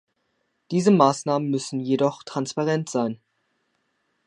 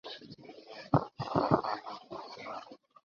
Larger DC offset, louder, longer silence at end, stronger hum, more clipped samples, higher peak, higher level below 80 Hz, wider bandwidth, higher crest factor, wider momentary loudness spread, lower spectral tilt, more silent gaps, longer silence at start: neither; first, -23 LUFS vs -34 LUFS; first, 1.1 s vs 0.3 s; neither; neither; first, -2 dBFS vs -10 dBFS; second, -74 dBFS vs -64 dBFS; first, 11 kHz vs 7 kHz; about the same, 22 dB vs 26 dB; second, 11 LU vs 20 LU; about the same, -6 dB/octave vs -6 dB/octave; neither; first, 0.7 s vs 0.05 s